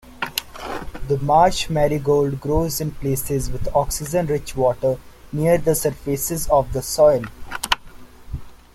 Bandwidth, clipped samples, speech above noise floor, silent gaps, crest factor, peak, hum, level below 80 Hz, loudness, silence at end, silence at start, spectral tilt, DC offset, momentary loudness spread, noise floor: 16.5 kHz; under 0.1%; 21 dB; none; 20 dB; 0 dBFS; none; -36 dBFS; -20 LUFS; 0.2 s; 0.05 s; -5 dB/octave; under 0.1%; 15 LU; -40 dBFS